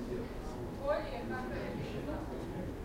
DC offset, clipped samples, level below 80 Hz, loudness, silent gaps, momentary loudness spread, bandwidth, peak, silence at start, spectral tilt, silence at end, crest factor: under 0.1%; under 0.1%; -48 dBFS; -40 LUFS; none; 6 LU; 16 kHz; -20 dBFS; 0 s; -7 dB/octave; 0 s; 18 dB